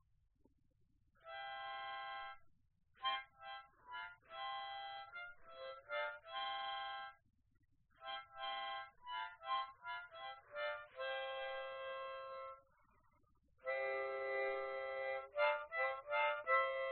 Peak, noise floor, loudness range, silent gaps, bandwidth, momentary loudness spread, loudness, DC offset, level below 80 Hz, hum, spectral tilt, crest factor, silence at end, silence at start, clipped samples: -24 dBFS; -77 dBFS; 7 LU; none; 4.3 kHz; 15 LU; -44 LUFS; under 0.1%; -80 dBFS; none; 2.5 dB/octave; 22 dB; 0 s; 1.25 s; under 0.1%